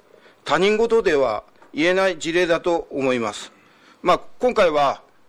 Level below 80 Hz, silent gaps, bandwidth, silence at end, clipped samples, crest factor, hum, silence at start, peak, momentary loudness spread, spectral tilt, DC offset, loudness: -50 dBFS; none; 12.5 kHz; 0.3 s; under 0.1%; 18 dB; none; 0.45 s; -4 dBFS; 12 LU; -4.5 dB/octave; under 0.1%; -20 LUFS